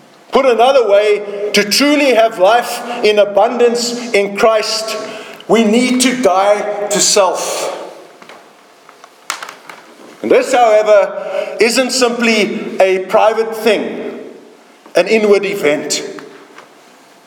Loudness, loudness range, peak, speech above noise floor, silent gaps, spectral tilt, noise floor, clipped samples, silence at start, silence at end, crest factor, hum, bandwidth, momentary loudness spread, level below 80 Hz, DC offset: -12 LUFS; 5 LU; 0 dBFS; 31 dB; none; -2.5 dB/octave; -43 dBFS; under 0.1%; 0.3 s; 0.65 s; 14 dB; none; 19 kHz; 14 LU; -60 dBFS; under 0.1%